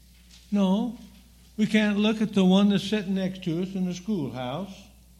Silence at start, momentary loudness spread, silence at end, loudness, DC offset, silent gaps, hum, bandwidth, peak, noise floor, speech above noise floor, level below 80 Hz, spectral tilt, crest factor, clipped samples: 0.5 s; 13 LU; 0.35 s; -25 LUFS; under 0.1%; none; none; 12 kHz; -10 dBFS; -52 dBFS; 28 dB; -56 dBFS; -6.5 dB/octave; 16 dB; under 0.1%